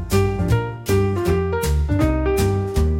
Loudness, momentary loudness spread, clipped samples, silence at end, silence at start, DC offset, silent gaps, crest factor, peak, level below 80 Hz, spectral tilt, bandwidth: -20 LUFS; 2 LU; under 0.1%; 0 s; 0 s; 0.1%; none; 14 dB; -6 dBFS; -26 dBFS; -6.5 dB/octave; 16.5 kHz